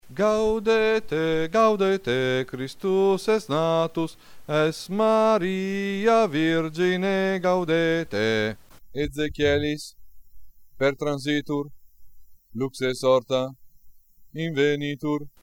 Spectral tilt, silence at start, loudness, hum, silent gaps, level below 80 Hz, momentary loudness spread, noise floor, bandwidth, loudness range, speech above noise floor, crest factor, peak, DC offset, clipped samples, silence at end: -5.5 dB/octave; 0.05 s; -24 LUFS; none; none; -50 dBFS; 10 LU; -49 dBFS; 16.5 kHz; 5 LU; 26 dB; 16 dB; -8 dBFS; under 0.1%; under 0.1%; 0.15 s